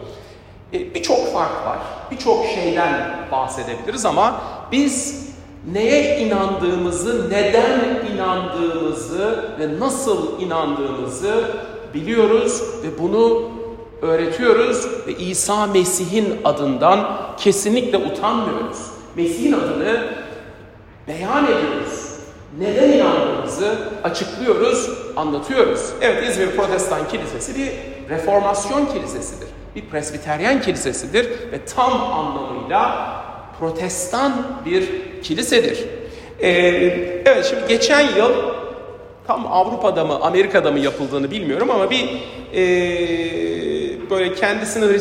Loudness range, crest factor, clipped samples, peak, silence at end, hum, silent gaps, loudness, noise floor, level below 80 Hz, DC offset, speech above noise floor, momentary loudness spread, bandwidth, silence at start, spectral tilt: 4 LU; 18 dB; under 0.1%; 0 dBFS; 0 s; none; none; -19 LUFS; -41 dBFS; -46 dBFS; under 0.1%; 23 dB; 13 LU; 16 kHz; 0 s; -4 dB/octave